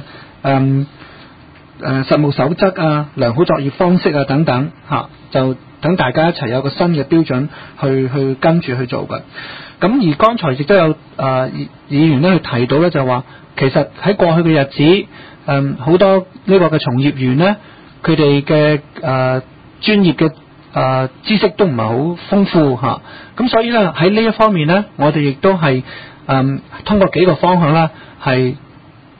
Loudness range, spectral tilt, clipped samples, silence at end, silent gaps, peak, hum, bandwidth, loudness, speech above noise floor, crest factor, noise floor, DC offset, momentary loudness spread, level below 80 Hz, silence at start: 3 LU; -10 dB/octave; under 0.1%; 0.6 s; none; 0 dBFS; none; 5 kHz; -14 LUFS; 27 dB; 14 dB; -41 dBFS; 0.3%; 9 LU; -46 dBFS; 0 s